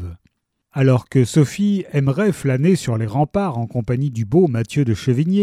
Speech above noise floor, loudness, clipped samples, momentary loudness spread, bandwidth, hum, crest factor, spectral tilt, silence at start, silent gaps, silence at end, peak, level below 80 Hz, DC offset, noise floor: 46 dB; -18 LUFS; under 0.1%; 5 LU; 14 kHz; none; 14 dB; -7.5 dB/octave; 0 s; none; 0 s; -2 dBFS; -48 dBFS; under 0.1%; -63 dBFS